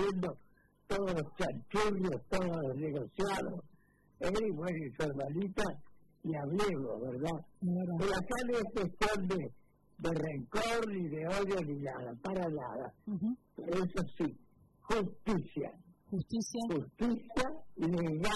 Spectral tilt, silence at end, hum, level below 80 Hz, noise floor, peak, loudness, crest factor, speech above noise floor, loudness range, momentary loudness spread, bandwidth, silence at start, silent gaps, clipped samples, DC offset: -6 dB/octave; 0 s; none; -54 dBFS; -57 dBFS; -16 dBFS; -37 LUFS; 20 dB; 22 dB; 2 LU; 7 LU; 12 kHz; 0 s; none; under 0.1%; under 0.1%